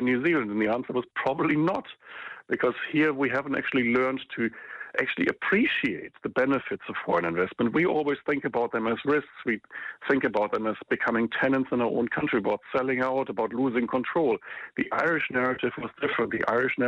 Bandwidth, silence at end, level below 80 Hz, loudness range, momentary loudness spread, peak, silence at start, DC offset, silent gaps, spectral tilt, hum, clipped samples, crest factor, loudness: 7.2 kHz; 0 s; -64 dBFS; 1 LU; 7 LU; -8 dBFS; 0 s; under 0.1%; none; -7.5 dB/octave; none; under 0.1%; 18 dB; -27 LUFS